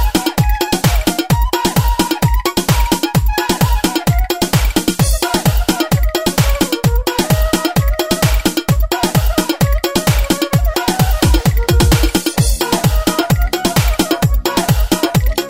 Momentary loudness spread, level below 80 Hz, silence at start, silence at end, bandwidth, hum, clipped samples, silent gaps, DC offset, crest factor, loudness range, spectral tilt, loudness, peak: 2 LU; -18 dBFS; 0 s; 0 s; 16.5 kHz; none; under 0.1%; none; 0.2%; 12 dB; 1 LU; -4.5 dB/octave; -14 LUFS; -2 dBFS